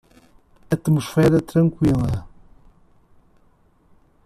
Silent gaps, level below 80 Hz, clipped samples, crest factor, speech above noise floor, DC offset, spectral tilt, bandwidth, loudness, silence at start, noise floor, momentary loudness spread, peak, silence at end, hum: none; -44 dBFS; under 0.1%; 18 dB; 39 dB; under 0.1%; -8 dB/octave; 14 kHz; -20 LUFS; 0.7 s; -57 dBFS; 9 LU; -4 dBFS; 1.95 s; none